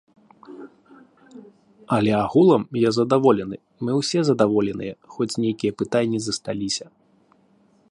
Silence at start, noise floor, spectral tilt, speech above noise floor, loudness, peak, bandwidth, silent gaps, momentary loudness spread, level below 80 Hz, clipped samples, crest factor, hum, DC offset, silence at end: 0.5 s; -59 dBFS; -5.5 dB/octave; 38 dB; -21 LUFS; -2 dBFS; 11.5 kHz; none; 14 LU; -58 dBFS; under 0.1%; 20 dB; none; under 0.1%; 1.1 s